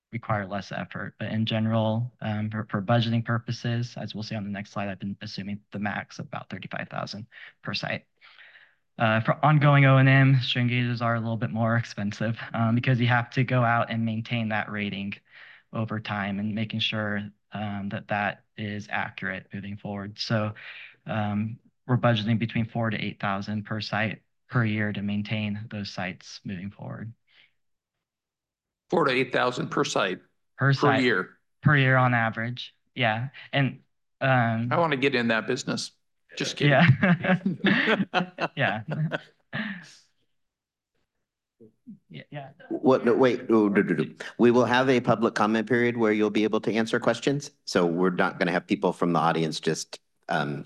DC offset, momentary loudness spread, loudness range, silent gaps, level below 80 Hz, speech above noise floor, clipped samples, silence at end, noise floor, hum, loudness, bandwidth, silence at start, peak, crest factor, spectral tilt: under 0.1%; 15 LU; 11 LU; none; -62 dBFS; 64 dB; under 0.1%; 0 s; -89 dBFS; none; -26 LUFS; 10 kHz; 0.1 s; -6 dBFS; 20 dB; -6.5 dB/octave